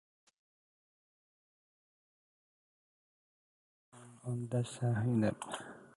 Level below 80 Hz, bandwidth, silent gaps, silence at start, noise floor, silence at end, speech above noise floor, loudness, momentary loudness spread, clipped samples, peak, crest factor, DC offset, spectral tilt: -70 dBFS; 11.5 kHz; none; 3.95 s; under -90 dBFS; 0.1 s; over 55 dB; -36 LUFS; 12 LU; under 0.1%; -20 dBFS; 20 dB; under 0.1%; -7 dB/octave